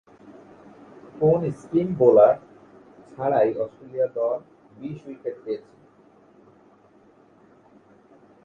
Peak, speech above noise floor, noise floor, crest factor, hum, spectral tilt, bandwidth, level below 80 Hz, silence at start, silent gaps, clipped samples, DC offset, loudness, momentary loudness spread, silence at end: -4 dBFS; 34 dB; -55 dBFS; 22 dB; none; -9.5 dB/octave; 7.2 kHz; -64 dBFS; 0.25 s; none; under 0.1%; under 0.1%; -22 LUFS; 19 LU; 2.85 s